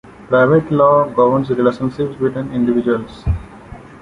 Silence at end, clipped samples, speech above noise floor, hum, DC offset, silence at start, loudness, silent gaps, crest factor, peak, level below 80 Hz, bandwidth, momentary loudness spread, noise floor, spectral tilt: 0.05 s; under 0.1%; 21 dB; none; under 0.1%; 0.05 s; -16 LUFS; none; 14 dB; -2 dBFS; -34 dBFS; 10.5 kHz; 10 LU; -36 dBFS; -9 dB/octave